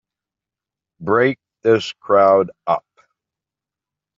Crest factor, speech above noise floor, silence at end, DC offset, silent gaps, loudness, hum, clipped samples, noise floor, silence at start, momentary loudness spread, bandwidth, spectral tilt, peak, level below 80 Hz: 18 dB; 72 dB; 1.4 s; under 0.1%; none; -17 LUFS; none; under 0.1%; -88 dBFS; 1 s; 9 LU; 7.6 kHz; -4 dB/octave; -2 dBFS; -66 dBFS